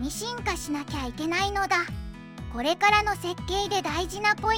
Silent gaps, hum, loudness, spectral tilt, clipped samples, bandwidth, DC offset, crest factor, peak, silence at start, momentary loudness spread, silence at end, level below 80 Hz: none; none; -26 LUFS; -3.5 dB/octave; under 0.1%; 17 kHz; under 0.1%; 20 dB; -8 dBFS; 0 s; 13 LU; 0 s; -42 dBFS